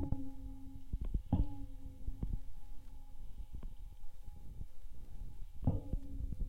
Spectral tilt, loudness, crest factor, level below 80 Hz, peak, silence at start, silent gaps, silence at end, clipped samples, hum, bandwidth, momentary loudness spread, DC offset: -9.5 dB/octave; -45 LUFS; 18 dB; -44 dBFS; -20 dBFS; 0 s; none; 0 s; under 0.1%; none; 4 kHz; 19 LU; under 0.1%